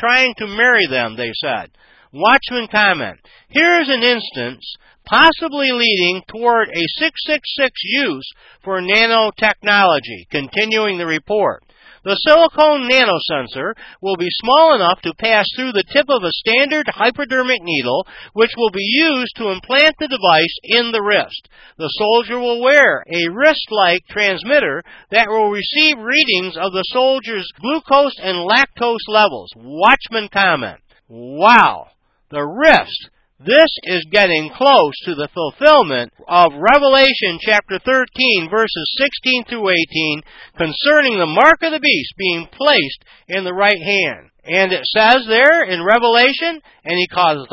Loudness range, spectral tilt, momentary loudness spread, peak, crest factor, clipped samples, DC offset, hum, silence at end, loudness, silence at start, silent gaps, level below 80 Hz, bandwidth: 3 LU; -4 dB/octave; 12 LU; 0 dBFS; 16 dB; under 0.1%; under 0.1%; none; 0.05 s; -14 LUFS; 0 s; none; -52 dBFS; 8 kHz